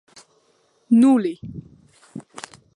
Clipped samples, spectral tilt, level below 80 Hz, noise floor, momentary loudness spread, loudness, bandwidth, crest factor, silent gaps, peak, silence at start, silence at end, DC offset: under 0.1%; -6.5 dB/octave; -60 dBFS; -63 dBFS; 26 LU; -17 LUFS; 11 kHz; 16 dB; none; -6 dBFS; 0.9 s; 0.55 s; under 0.1%